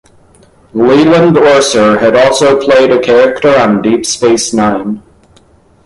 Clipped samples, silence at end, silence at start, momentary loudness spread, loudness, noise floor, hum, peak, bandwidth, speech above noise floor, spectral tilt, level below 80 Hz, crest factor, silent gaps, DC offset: under 0.1%; 0.85 s; 0.75 s; 7 LU; -8 LUFS; -45 dBFS; none; 0 dBFS; 11.5 kHz; 37 dB; -4.5 dB/octave; -44 dBFS; 8 dB; none; under 0.1%